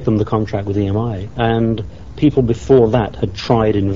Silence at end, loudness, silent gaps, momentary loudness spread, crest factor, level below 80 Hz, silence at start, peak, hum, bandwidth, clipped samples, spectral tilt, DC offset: 0 s; -16 LUFS; none; 10 LU; 16 dB; -34 dBFS; 0 s; 0 dBFS; none; 7.6 kHz; under 0.1%; -7 dB/octave; 1%